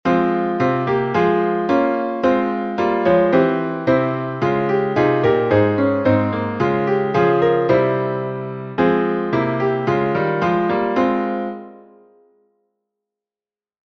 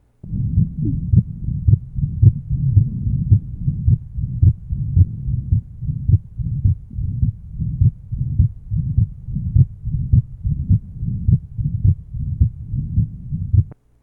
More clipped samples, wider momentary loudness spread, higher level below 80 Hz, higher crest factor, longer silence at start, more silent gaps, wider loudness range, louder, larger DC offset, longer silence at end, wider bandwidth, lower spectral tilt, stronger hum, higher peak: neither; second, 6 LU vs 9 LU; second, -52 dBFS vs -26 dBFS; about the same, 16 dB vs 18 dB; second, 0.05 s vs 0.25 s; neither; about the same, 4 LU vs 3 LU; about the same, -18 LUFS vs -20 LUFS; neither; first, 2.2 s vs 0.3 s; first, 6.2 kHz vs 0.6 kHz; second, -8.5 dB/octave vs -15 dB/octave; neither; about the same, -2 dBFS vs 0 dBFS